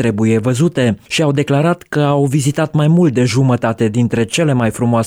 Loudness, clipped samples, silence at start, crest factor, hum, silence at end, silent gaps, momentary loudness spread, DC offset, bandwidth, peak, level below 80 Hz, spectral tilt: -14 LUFS; under 0.1%; 0 s; 10 dB; none; 0 s; none; 3 LU; under 0.1%; 16 kHz; -4 dBFS; -48 dBFS; -6.5 dB/octave